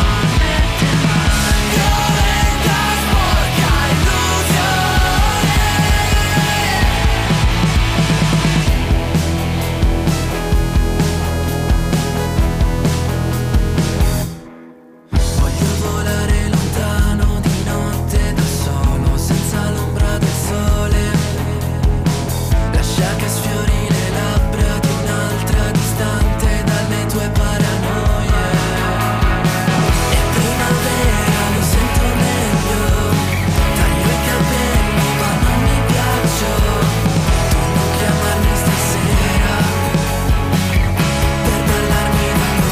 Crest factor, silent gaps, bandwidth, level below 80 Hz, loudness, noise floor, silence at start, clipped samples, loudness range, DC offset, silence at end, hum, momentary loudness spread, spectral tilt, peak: 10 dB; none; 16 kHz; -20 dBFS; -16 LUFS; -40 dBFS; 0 s; under 0.1%; 3 LU; under 0.1%; 0 s; none; 4 LU; -5 dB/octave; -6 dBFS